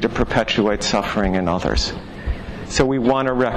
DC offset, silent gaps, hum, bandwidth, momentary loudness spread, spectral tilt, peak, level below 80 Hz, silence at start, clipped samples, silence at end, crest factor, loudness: under 0.1%; none; none; 12.5 kHz; 11 LU; -5 dB/octave; -6 dBFS; -30 dBFS; 0 s; under 0.1%; 0 s; 14 dB; -20 LUFS